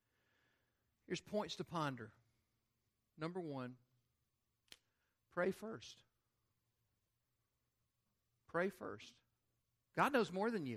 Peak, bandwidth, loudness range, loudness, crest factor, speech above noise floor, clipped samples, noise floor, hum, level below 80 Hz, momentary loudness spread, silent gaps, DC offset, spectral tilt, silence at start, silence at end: -20 dBFS; 14 kHz; 7 LU; -43 LUFS; 26 dB; 45 dB; under 0.1%; -87 dBFS; none; -84 dBFS; 17 LU; none; under 0.1%; -5.5 dB/octave; 1.1 s; 0 s